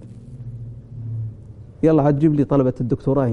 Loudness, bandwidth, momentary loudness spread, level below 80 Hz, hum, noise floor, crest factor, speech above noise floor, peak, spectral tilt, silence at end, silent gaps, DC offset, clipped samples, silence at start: -19 LUFS; 6.8 kHz; 20 LU; -42 dBFS; none; -39 dBFS; 16 dB; 22 dB; -4 dBFS; -10.5 dB/octave; 0 s; none; under 0.1%; under 0.1%; 0 s